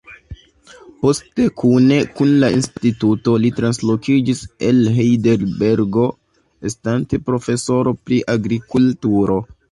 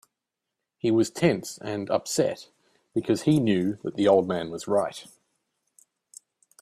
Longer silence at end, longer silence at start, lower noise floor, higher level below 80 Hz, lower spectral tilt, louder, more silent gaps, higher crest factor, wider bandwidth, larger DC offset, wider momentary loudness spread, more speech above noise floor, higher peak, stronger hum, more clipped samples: second, 0.25 s vs 1.6 s; second, 0.1 s vs 0.85 s; second, -45 dBFS vs -85 dBFS; first, -46 dBFS vs -64 dBFS; about the same, -6.5 dB/octave vs -5.5 dB/octave; first, -17 LUFS vs -25 LUFS; neither; second, 14 dB vs 20 dB; second, 11.5 kHz vs 14.5 kHz; neither; second, 6 LU vs 11 LU; second, 29 dB vs 61 dB; first, -2 dBFS vs -6 dBFS; neither; neither